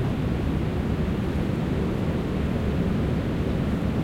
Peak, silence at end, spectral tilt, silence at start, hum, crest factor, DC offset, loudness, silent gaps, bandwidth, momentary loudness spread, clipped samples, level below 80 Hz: -14 dBFS; 0 s; -8 dB/octave; 0 s; none; 12 dB; under 0.1%; -26 LUFS; none; 16 kHz; 1 LU; under 0.1%; -34 dBFS